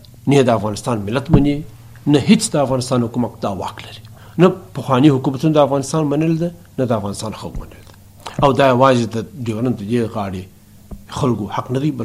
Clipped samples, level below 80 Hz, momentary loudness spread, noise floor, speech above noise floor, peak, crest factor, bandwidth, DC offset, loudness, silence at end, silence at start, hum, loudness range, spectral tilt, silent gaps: under 0.1%; -38 dBFS; 16 LU; -37 dBFS; 21 dB; 0 dBFS; 18 dB; 15.5 kHz; under 0.1%; -17 LUFS; 0 s; 0.25 s; none; 3 LU; -6.5 dB/octave; none